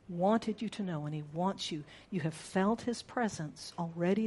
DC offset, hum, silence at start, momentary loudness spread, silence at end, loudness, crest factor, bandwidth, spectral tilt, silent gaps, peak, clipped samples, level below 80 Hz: under 0.1%; none; 0.1 s; 10 LU; 0 s; -35 LUFS; 18 dB; 11.5 kHz; -6 dB/octave; none; -16 dBFS; under 0.1%; -68 dBFS